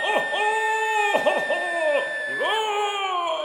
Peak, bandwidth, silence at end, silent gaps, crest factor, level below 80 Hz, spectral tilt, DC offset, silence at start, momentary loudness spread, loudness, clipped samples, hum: -8 dBFS; over 20 kHz; 0 s; none; 16 dB; -74 dBFS; -1 dB/octave; under 0.1%; 0 s; 4 LU; -23 LUFS; under 0.1%; none